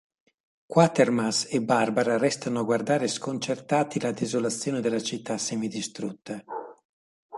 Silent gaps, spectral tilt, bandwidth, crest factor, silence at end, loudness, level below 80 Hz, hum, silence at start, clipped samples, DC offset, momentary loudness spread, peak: 6.85-7.29 s; -4.5 dB/octave; 11.5 kHz; 22 dB; 0 s; -26 LUFS; -70 dBFS; none; 0.7 s; under 0.1%; under 0.1%; 12 LU; -6 dBFS